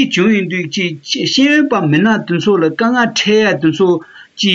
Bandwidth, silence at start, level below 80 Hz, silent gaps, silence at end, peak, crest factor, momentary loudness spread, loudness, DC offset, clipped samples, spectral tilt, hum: 7.8 kHz; 0 s; -58 dBFS; none; 0 s; -2 dBFS; 12 dB; 7 LU; -13 LUFS; under 0.1%; under 0.1%; -5 dB/octave; none